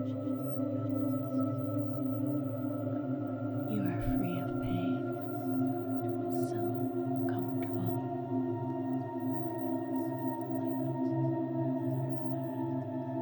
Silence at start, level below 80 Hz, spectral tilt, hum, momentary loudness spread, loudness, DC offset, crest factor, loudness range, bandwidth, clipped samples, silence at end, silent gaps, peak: 0 s; -56 dBFS; -9.5 dB/octave; none; 3 LU; -34 LUFS; under 0.1%; 14 dB; 1 LU; over 20 kHz; under 0.1%; 0 s; none; -20 dBFS